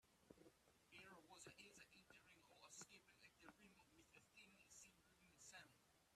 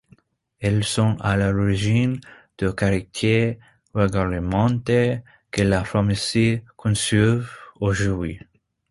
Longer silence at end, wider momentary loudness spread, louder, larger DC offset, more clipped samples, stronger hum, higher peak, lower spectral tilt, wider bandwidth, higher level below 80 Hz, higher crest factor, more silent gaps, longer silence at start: second, 0 s vs 0.5 s; about the same, 7 LU vs 8 LU; second, -66 LUFS vs -22 LUFS; neither; neither; neither; second, -46 dBFS vs -4 dBFS; second, -2 dB/octave vs -6 dB/octave; first, 14 kHz vs 11.5 kHz; second, -90 dBFS vs -40 dBFS; about the same, 22 dB vs 18 dB; neither; second, 0 s vs 0.6 s